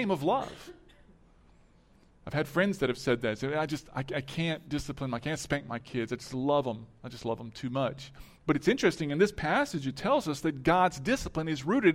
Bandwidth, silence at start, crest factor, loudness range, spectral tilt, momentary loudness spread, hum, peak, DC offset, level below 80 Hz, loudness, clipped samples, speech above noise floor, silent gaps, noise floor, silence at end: 16 kHz; 0 s; 20 dB; 5 LU; -5.5 dB/octave; 11 LU; none; -10 dBFS; under 0.1%; -54 dBFS; -31 LUFS; under 0.1%; 31 dB; none; -61 dBFS; 0 s